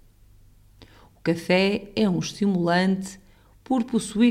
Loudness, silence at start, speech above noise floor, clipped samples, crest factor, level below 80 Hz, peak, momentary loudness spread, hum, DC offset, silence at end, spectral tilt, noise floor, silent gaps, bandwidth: -24 LUFS; 0.8 s; 31 dB; under 0.1%; 18 dB; -54 dBFS; -8 dBFS; 7 LU; none; under 0.1%; 0 s; -5.5 dB/octave; -53 dBFS; none; 14 kHz